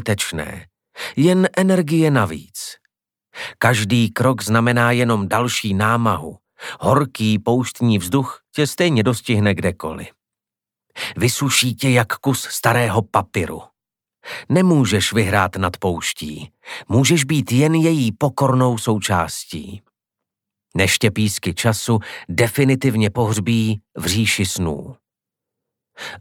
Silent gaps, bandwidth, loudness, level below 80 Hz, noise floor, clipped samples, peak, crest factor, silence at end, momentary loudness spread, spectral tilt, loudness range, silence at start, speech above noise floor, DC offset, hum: none; 18.5 kHz; -18 LUFS; -50 dBFS; -88 dBFS; under 0.1%; 0 dBFS; 18 dB; 0 s; 15 LU; -5 dB/octave; 3 LU; 0 s; 70 dB; under 0.1%; none